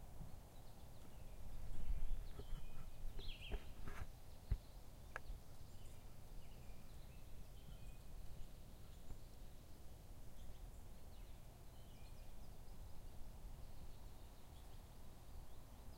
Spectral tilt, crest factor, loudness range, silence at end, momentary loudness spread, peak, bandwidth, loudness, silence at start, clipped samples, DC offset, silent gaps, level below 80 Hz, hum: -5 dB/octave; 18 dB; 7 LU; 0 s; 10 LU; -30 dBFS; 16 kHz; -58 LUFS; 0 s; under 0.1%; under 0.1%; none; -52 dBFS; none